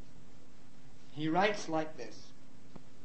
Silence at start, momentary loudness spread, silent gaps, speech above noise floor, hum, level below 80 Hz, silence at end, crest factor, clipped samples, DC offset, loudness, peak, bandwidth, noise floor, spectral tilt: 0 s; 26 LU; none; 25 dB; none; -68 dBFS; 0.2 s; 22 dB; under 0.1%; 1%; -34 LUFS; -16 dBFS; 8.4 kHz; -59 dBFS; -5 dB/octave